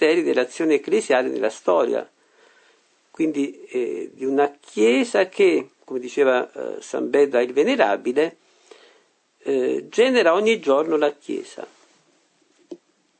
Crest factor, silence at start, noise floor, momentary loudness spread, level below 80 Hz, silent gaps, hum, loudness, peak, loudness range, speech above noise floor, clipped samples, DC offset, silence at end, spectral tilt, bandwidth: 20 dB; 0 s; -62 dBFS; 13 LU; -78 dBFS; none; none; -21 LUFS; -2 dBFS; 4 LU; 42 dB; under 0.1%; under 0.1%; 0.45 s; -4 dB/octave; 9 kHz